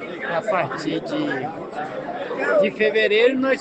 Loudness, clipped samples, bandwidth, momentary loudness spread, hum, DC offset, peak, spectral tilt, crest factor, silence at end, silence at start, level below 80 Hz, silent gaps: -21 LUFS; under 0.1%; 8.6 kHz; 12 LU; none; under 0.1%; -6 dBFS; -5.5 dB/octave; 16 dB; 0 s; 0 s; -64 dBFS; none